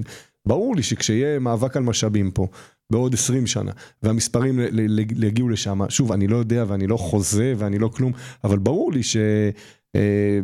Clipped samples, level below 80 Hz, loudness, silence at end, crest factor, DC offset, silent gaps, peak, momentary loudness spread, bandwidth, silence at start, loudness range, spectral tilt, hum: under 0.1%; -48 dBFS; -21 LUFS; 0 s; 16 dB; under 0.1%; none; -6 dBFS; 6 LU; 14 kHz; 0 s; 1 LU; -5.5 dB/octave; none